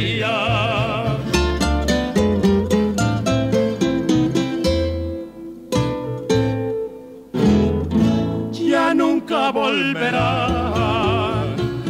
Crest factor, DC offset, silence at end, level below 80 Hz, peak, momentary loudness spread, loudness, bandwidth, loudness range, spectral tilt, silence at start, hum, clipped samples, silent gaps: 16 dB; under 0.1%; 0 s; -32 dBFS; -4 dBFS; 7 LU; -19 LUFS; 15.5 kHz; 3 LU; -6 dB/octave; 0 s; none; under 0.1%; none